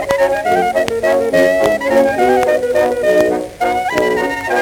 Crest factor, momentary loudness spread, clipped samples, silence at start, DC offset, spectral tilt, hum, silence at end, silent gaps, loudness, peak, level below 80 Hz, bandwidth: 14 dB; 4 LU; under 0.1%; 0 s; under 0.1%; -4.5 dB/octave; none; 0 s; none; -14 LUFS; 0 dBFS; -44 dBFS; 19.5 kHz